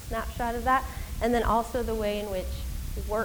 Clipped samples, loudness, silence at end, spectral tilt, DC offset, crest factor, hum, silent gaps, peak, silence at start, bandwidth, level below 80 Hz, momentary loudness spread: under 0.1%; -29 LUFS; 0 s; -5.5 dB/octave; 0.2%; 18 dB; none; none; -12 dBFS; 0 s; over 20 kHz; -36 dBFS; 11 LU